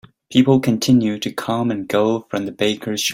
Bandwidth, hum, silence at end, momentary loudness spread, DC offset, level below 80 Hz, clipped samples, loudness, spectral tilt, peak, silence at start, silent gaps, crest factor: 16.5 kHz; none; 0 s; 8 LU; under 0.1%; -56 dBFS; under 0.1%; -18 LUFS; -5 dB/octave; -2 dBFS; 0.3 s; none; 16 dB